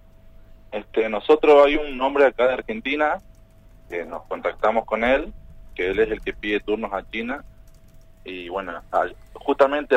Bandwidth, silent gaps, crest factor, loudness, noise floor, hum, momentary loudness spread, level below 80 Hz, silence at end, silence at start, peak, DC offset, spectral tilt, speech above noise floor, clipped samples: 8 kHz; none; 20 dB; -22 LUFS; -49 dBFS; none; 15 LU; -44 dBFS; 0 s; 0.25 s; -2 dBFS; under 0.1%; -5.5 dB/octave; 28 dB; under 0.1%